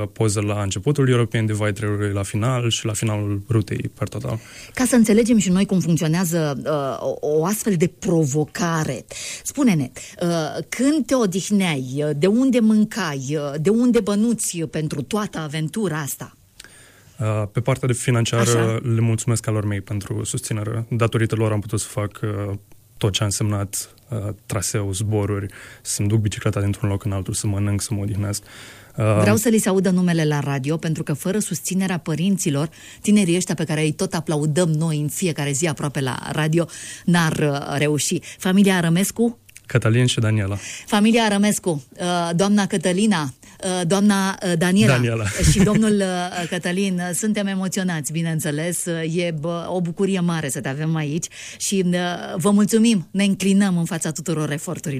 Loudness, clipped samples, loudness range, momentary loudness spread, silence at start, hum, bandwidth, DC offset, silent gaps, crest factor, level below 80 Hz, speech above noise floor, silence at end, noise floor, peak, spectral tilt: -21 LUFS; under 0.1%; 4 LU; 10 LU; 0 s; none; 15.5 kHz; under 0.1%; none; 16 dB; -46 dBFS; 28 dB; 0 s; -48 dBFS; -4 dBFS; -5.5 dB/octave